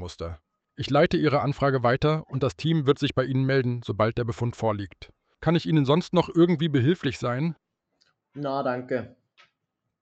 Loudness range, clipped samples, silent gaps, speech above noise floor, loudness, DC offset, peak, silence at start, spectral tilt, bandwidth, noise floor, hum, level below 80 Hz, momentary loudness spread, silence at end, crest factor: 3 LU; under 0.1%; none; 57 dB; -25 LUFS; under 0.1%; -8 dBFS; 0 s; -7.5 dB/octave; 8.4 kHz; -81 dBFS; none; -52 dBFS; 13 LU; 0.95 s; 18 dB